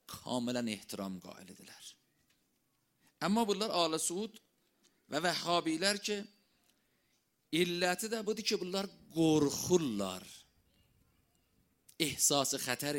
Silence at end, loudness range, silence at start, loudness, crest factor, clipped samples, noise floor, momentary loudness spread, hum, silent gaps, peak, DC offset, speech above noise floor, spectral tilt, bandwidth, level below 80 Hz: 0 s; 4 LU; 0.1 s; -34 LUFS; 24 dB; under 0.1%; -78 dBFS; 19 LU; none; none; -14 dBFS; under 0.1%; 44 dB; -3 dB/octave; 16.5 kHz; -72 dBFS